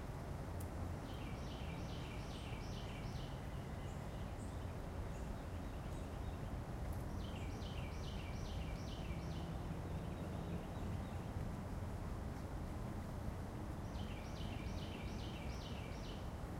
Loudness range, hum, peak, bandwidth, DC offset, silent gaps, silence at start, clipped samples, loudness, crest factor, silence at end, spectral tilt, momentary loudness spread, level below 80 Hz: 1 LU; none; -32 dBFS; 16 kHz; under 0.1%; none; 0 s; under 0.1%; -47 LUFS; 14 dB; 0 s; -6.5 dB/octave; 2 LU; -50 dBFS